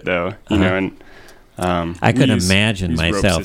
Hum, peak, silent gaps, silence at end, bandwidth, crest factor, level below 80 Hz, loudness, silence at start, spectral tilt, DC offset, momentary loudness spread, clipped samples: none; 0 dBFS; none; 0 s; 16.5 kHz; 18 dB; -36 dBFS; -17 LUFS; 0.05 s; -5 dB/octave; under 0.1%; 7 LU; under 0.1%